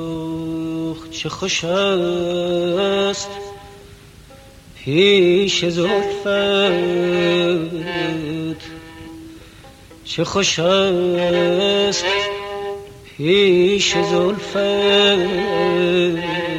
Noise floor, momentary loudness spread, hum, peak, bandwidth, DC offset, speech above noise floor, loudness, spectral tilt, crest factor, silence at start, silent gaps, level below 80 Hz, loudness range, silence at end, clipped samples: -42 dBFS; 15 LU; none; -2 dBFS; 12 kHz; under 0.1%; 25 dB; -17 LUFS; -4 dB/octave; 16 dB; 0 s; none; -48 dBFS; 5 LU; 0 s; under 0.1%